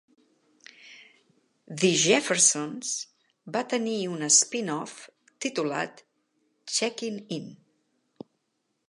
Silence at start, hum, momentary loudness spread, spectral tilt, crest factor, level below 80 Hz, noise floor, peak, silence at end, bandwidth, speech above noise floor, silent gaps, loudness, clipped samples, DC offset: 0.85 s; none; 21 LU; -2 dB/octave; 24 dB; -84 dBFS; -77 dBFS; -6 dBFS; 1.35 s; 11.5 kHz; 51 dB; none; -25 LUFS; under 0.1%; under 0.1%